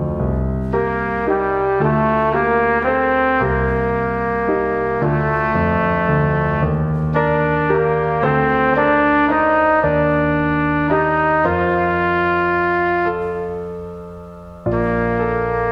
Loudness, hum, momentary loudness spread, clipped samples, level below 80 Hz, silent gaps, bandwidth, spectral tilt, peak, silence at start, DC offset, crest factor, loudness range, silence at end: -17 LUFS; none; 6 LU; under 0.1%; -32 dBFS; none; 5.6 kHz; -9.5 dB/octave; -2 dBFS; 0 s; under 0.1%; 14 dB; 3 LU; 0 s